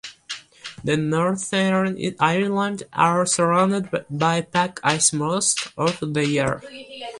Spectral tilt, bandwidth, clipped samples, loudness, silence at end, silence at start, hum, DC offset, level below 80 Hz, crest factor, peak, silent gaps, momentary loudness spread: -4 dB/octave; 11.5 kHz; under 0.1%; -21 LUFS; 0 s; 0.05 s; none; under 0.1%; -58 dBFS; 20 dB; -2 dBFS; none; 14 LU